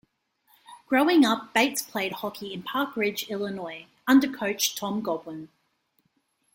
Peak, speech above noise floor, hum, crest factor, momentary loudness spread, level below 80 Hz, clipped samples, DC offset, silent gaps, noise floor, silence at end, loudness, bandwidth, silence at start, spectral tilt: -8 dBFS; 46 dB; none; 20 dB; 14 LU; -72 dBFS; under 0.1%; under 0.1%; none; -72 dBFS; 1.1 s; -25 LUFS; 16.5 kHz; 0.7 s; -3 dB/octave